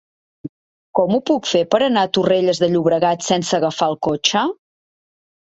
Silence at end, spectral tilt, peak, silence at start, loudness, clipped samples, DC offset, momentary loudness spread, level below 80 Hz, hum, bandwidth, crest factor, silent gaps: 0.95 s; -4.5 dB/octave; -2 dBFS; 0.45 s; -17 LUFS; under 0.1%; under 0.1%; 17 LU; -58 dBFS; none; 8.2 kHz; 18 dB; 0.49-0.94 s